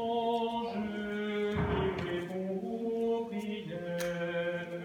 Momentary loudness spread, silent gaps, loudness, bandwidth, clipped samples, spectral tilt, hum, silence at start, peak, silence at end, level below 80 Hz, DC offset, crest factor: 5 LU; none; -34 LUFS; 19 kHz; under 0.1%; -6.5 dB/octave; none; 0 s; -20 dBFS; 0 s; -54 dBFS; under 0.1%; 14 dB